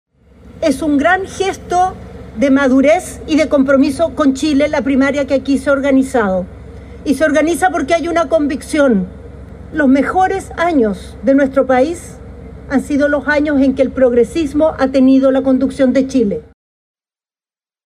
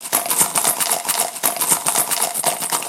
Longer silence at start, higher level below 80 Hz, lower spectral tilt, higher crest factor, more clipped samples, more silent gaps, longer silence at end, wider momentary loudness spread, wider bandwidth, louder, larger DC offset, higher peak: first, 0.45 s vs 0 s; first, -38 dBFS vs -70 dBFS; first, -5.5 dB/octave vs 0 dB/octave; second, 12 dB vs 20 dB; neither; neither; first, 1.45 s vs 0 s; first, 13 LU vs 3 LU; second, 12.5 kHz vs 17 kHz; first, -14 LUFS vs -17 LUFS; neither; about the same, -2 dBFS vs 0 dBFS